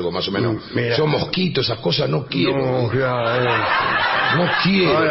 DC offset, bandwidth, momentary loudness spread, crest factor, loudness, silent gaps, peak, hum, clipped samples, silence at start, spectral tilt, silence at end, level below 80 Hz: under 0.1%; 6 kHz; 5 LU; 14 dB; -18 LUFS; none; -6 dBFS; none; under 0.1%; 0 s; -9 dB/octave; 0 s; -50 dBFS